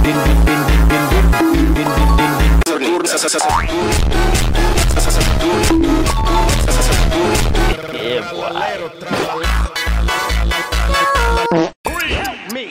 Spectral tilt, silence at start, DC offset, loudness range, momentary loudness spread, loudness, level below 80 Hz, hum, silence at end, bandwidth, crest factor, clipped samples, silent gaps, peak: -4.5 dB/octave; 0 s; under 0.1%; 4 LU; 7 LU; -15 LUFS; -16 dBFS; none; 0 s; 16.5 kHz; 10 dB; under 0.1%; 11.76-11.84 s; -2 dBFS